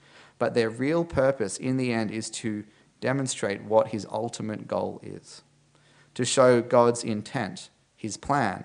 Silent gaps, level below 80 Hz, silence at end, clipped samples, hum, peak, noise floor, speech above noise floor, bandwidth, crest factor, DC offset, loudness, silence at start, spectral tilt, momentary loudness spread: none; -60 dBFS; 0 s; under 0.1%; none; -6 dBFS; -60 dBFS; 35 dB; 10.5 kHz; 22 dB; under 0.1%; -26 LUFS; 0.4 s; -5 dB/octave; 15 LU